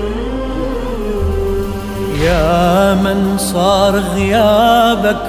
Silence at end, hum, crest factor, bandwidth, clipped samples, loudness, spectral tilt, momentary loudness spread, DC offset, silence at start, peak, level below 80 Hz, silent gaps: 0 s; none; 12 dB; 16 kHz; under 0.1%; -14 LUFS; -5.5 dB/octave; 10 LU; 0.8%; 0 s; 0 dBFS; -24 dBFS; none